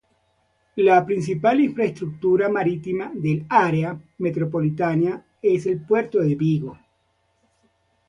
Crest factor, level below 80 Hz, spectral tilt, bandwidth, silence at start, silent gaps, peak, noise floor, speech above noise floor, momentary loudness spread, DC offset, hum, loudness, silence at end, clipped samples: 18 dB; -60 dBFS; -8.5 dB/octave; 10.5 kHz; 0.75 s; none; -4 dBFS; -67 dBFS; 47 dB; 8 LU; under 0.1%; none; -21 LUFS; 1.35 s; under 0.1%